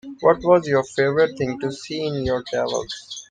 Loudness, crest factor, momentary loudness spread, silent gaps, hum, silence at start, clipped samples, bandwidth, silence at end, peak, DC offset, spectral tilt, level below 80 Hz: -21 LUFS; 18 dB; 10 LU; none; none; 0.05 s; under 0.1%; 9.8 kHz; 0.05 s; -2 dBFS; under 0.1%; -5 dB/octave; -48 dBFS